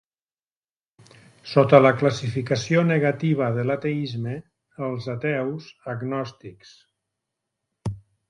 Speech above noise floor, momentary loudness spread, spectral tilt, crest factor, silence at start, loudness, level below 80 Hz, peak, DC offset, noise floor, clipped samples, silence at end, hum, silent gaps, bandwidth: over 68 dB; 19 LU; -7 dB/octave; 24 dB; 1.45 s; -22 LUFS; -58 dBFS; 0 dBFS; under 0.1%; under -90 dBFS; under 0.1%; 0.3 s; none; none; 10.5 kHz